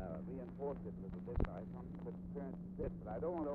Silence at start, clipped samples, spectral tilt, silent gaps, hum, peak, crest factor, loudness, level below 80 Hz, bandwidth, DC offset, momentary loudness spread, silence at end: 0 s; under 0.1%; -10 dB/octave; none; none; -22 dBFS; 22 dB; -46 LUFS; -50 dBFS; 4.4 kHz; under 0.1%; 6 LU; 0 s